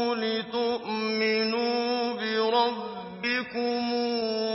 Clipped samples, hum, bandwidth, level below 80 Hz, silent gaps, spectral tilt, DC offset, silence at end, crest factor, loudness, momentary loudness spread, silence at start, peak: under 0.1%; none; 5.8 kHz; -72 dBFS; none; -7 dB/octave; under 0.1%; 0 s; 16 dB; -27 LUFS; 4 LU; 0 s; -10 dBFS